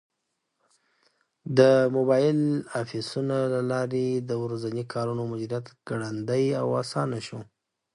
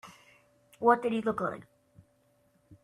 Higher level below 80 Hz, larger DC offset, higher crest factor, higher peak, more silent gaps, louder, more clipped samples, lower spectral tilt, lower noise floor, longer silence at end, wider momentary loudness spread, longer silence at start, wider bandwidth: about the same, -70 dBFS vs -72 dBFS; neither; about the same, 22 dB vs 24 dB; first, -4 dBFS vs -10 dBFS; neither; first, -26 LUFS vs -29 LUFS; neither; about the same, -7 dB/octave vs -6.5 dB/octave; first, -80 dBFS vs -69 dBFS; first, 0.5 s vs 0.1 s; second, 13 LU vs 20 LU; first, 1.45 s vs 0.05 s; second, 11.5 kHz vs 13 kHz